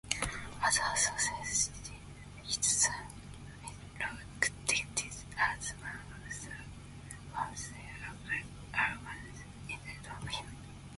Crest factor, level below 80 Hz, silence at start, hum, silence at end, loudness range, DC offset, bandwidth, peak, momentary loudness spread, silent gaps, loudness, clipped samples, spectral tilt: 26 dB; -54 dBFS; 0.05 s; none; 0 s; 7 LU; under 0.1%; 12 kHz; -12 dBFS; 18 LU; none; -34 LUFS; under 0.1%; -1 dB/octave